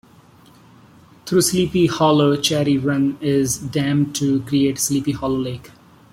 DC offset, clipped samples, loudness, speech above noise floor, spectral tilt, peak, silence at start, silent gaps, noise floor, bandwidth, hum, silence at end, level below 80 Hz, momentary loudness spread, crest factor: under 0.1%; under 0.1%; -19 LUFS; 30 dB; -5 dB/octave; -4 dBFS; 1.25 s; none; -48 dBFS; 16.5 kHz; none; 0.45 s; -50 dBFS; 7 LU; 16 dB